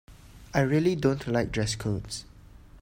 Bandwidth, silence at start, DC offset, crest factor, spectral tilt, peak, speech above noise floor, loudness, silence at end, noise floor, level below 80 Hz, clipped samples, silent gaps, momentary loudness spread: 16 kHz; 0.1 s; under 0.1%; 20 dB; -6 dB/octave; -10 dBFS; 24 dB; -28 LUFS; 0 s; -50 dBFS; -48 dBFS; under 0.1%; none; 10 LU